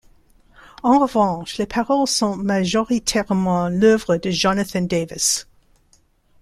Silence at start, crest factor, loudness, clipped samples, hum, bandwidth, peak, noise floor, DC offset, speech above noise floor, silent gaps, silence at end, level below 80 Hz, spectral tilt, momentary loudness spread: 0.85 s; 16 dB; -19 LUFS; under 0.1%; none; 14.5 kHz; -4 dBFS; -58 dBFS; under 0.1%; 40 dB; none; 1 s; -48 dBFS; -4 dB/octave; 7 LU